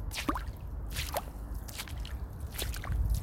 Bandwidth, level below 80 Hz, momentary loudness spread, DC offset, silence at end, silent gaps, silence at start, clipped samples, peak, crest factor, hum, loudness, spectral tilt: 17 kHz; -38 dBFS; 8 LU; under 0.1%; 0 s; none; 0 s; under 0.1%; -14 dBFS; 22 dB; none; -38 LUFS; -4 dB/octave